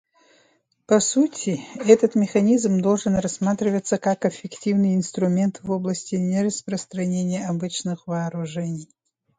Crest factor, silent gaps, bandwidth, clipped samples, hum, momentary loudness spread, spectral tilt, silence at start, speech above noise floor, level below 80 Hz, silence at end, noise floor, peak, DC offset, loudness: 22 dB; none; 9.6 kHz; under 0.1%; none; 10 LU; -6 dB/octave; 0.9 s; 41 dB; -58 dBFS; 0.55 s; -63 dBFS; -2 dBFS; under 0.1%; -22 LUFS